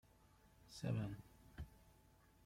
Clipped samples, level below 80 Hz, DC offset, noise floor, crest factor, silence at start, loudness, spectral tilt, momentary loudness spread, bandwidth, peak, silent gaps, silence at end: under 0.1%; -66 dBFS; under 0.1%; -70 dBFS; 20 dB; 0.45 s; -49 LUFS; -7 dB/octave; 22 LU; 16.5 kHz; -30 dBFS; none; 0.55 s